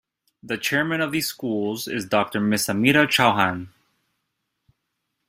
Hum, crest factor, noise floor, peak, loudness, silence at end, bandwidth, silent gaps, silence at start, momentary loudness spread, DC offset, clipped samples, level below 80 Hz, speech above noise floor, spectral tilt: none; 22 dB; -78 dBFS; -2 dBFS; -21 LUFS; 1.6 s; 16 kHz; none; 0.45 s; 10 LU; under 0.1%; under 0.1%; -60 dBFS; 56 dB; -4 dB/octave